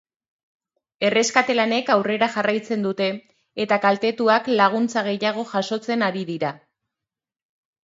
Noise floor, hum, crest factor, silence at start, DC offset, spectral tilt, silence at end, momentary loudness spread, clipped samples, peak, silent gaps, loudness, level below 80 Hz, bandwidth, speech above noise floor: -88 dBFS; none; 20 dB; 1 s; under 0.1%; -4 dB/octave; 1.25 s; 8 LU; under 0.1%; -2 dBFS; none; -21 LUFS; -72 dBFS; 8 kHz; 67 dB